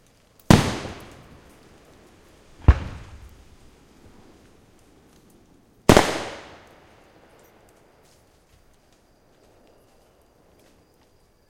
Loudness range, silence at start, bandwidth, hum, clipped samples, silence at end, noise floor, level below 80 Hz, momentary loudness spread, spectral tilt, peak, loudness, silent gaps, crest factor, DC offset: 5 LU; 0.5 s; 16.5 kHz; none; under 0.1%; 5.1 s; -59 dBFS; -34 dBFS; 29 LU; -5.5 dB/octave; 0 dBFS; -20 LUFS; none; 26 dB; under 0.1%